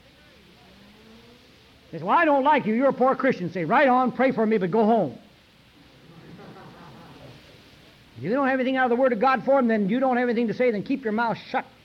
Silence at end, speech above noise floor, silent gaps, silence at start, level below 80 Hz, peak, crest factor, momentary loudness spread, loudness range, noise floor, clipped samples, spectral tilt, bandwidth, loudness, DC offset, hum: 0.2 s; 33 dB; none; 1.9 s; -64 dBFS; -10 dBFS; 14 dB; 9 LU; 8 LU; -54 dBFS; under 0.1%; -7.5 dB/octave; 6.8 kHz; -22 LUFS; under 0.1%; none